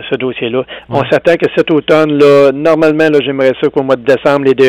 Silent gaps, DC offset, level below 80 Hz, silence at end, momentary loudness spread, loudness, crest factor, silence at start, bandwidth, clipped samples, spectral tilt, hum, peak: none; under 0.1%; -48 dBFS; 0 s; 9 LU; -10 LUFS; 8 dB; 0 s; 11.5 kHz; under 0.1%; -6.5 dB/octave; none; 0 dBFS